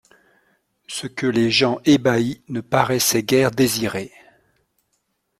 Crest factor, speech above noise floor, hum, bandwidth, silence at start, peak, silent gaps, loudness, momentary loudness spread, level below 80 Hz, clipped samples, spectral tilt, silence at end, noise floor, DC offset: 20 dB; 52 dB; none; 16.5 kHz; 0.9 s; -2 dBFS; none; -19 LUFS; 13 LU; -56 dBFS; under 0.1%; -4 dB/octave; 1.3 s; -71 dBFS; under 0.1%